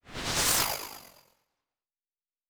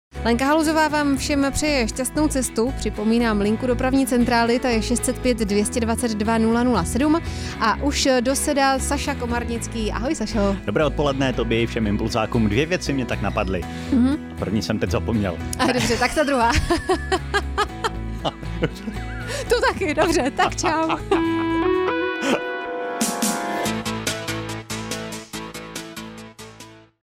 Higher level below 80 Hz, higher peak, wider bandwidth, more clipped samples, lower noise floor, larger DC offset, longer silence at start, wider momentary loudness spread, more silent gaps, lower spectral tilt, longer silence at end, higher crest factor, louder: second, -52 dBFS vs -34 dBFS; second, -14 dBFS vs -8 dBFS; first, over 20 kHz vs 16.5 kHz; neither; first, under -90 dBFS vs -44 dBFS; neither; about the same, 0.05 s vs 0.15 s; first, 19 LU vs 9 LU; neither; second, -1 dB/octave vs -4.5 dB/octave; first, 1.45 s vs 0.35 s; first, 22 dB vs 14 dB; second, -27 LUFS vs -21 LUFS